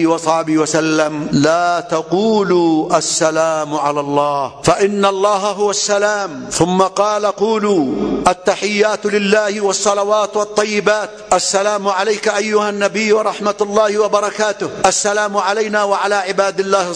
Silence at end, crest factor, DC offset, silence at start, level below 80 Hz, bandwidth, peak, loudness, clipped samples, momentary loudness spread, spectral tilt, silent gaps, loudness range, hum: 0 s; 14 dB; under 0.1%; 0 s; -50 dBFS; 11 kHz; 0 dBFS; -15 LUFS; under 0.1%; 4 LU; -3.5 dB/octave; none; 1 LU; none